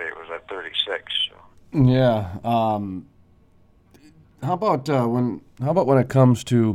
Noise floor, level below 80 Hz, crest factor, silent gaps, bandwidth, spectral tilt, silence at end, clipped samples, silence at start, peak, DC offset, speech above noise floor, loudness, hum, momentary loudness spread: -55 dBFS; -50 dBFS; 20 dB; none; 12 kHz; -7 dB/octave; 0 s; under 0.1%; 0 s; -2 dBFS; under 0.1%; 35 dB; -21 LUFS; none; 15 LU